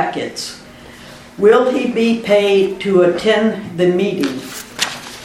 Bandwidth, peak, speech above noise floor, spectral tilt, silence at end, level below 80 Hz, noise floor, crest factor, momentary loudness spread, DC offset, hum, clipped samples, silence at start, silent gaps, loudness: 16.5 kHz; 0 dBFS; 23 dB; -5 dB/octave; 0 s; -52 dBFS; -37 dBFS; 16 dB; 16 LU; under 0.1%; none; under 0.1%; 0 s; none; -15 LUFS